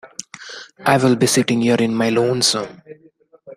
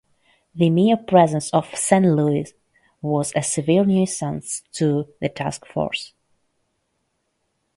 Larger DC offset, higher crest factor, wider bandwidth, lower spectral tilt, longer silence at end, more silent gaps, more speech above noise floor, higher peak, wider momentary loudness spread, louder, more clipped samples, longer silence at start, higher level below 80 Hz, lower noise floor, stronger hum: neither; about the same, 18 dB vs 20 dB; first, 15.5 kHz vs 11.5 kHz; second, -4 dB/octave vs -5.5 dB/octave; second, 0 s vs 1.7 s; neither; second, 28 dB vs 53 dB; about the same, -2 dBFS vs 0 dBFS; first, 19 LU vs 12 LU; first, -16 LUFS vs -20 LUFS; neither; second, 0.05 s vs 0.55 s; about the same, -60 dBFS vs -58 dBFS; second, -45 dBFS vs -72 dBFS; neither